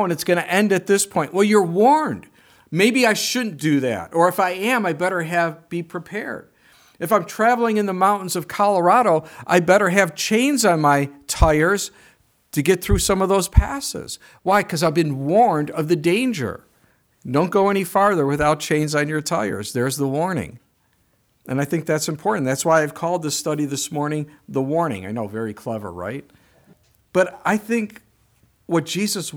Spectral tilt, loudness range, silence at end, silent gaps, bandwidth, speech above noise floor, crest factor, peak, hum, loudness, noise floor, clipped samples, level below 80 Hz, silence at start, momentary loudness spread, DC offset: -4.5 dB/octave; 7 LU; 0 s; none; over 20 kHz; 44 dB; 20 dB; 0 dBFS; none; -20 LUFS; -63 dBFS; under 0.1%; -36 dBFS; 0 s; 12 LU; under 0.1%